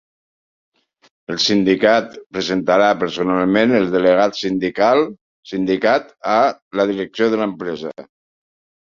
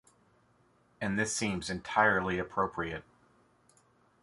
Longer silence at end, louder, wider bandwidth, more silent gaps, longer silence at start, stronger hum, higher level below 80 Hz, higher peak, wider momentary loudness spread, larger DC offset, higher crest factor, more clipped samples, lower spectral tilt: second, 0.8 s vs 1.2 s; first, -17 LUFS vs -31 LUFS; second, 7.6 kHz vs 11.5 kHz; first, 2.26-2.30 s, 5.21-5.43 s, 6.62-6.71 s vs none; first, 1.3 s vs 1 s; second, none vs 60 Hz at -65 dBFS; about the same, -58 dBFS vs -58 dBFS; first, 0 dBFS vs -10 dBFS; about the same, 11 LU vs 12 LU; neither; second, 18 dB vs 24 dB; neither; about the same, -5 dB/octave vs -4 dB/octave